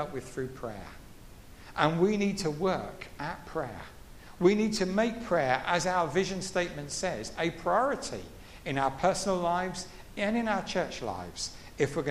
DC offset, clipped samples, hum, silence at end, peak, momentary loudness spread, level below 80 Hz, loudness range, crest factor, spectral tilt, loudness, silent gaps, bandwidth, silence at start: under 0.1%; under 0.1%; none; 0 s; -8 dBFS; 14 LU; -52 dBFS; 3 LU; 22 dB; -4.5 dB/octave; -30 LUFS; none; 15.5 kHz; 0 s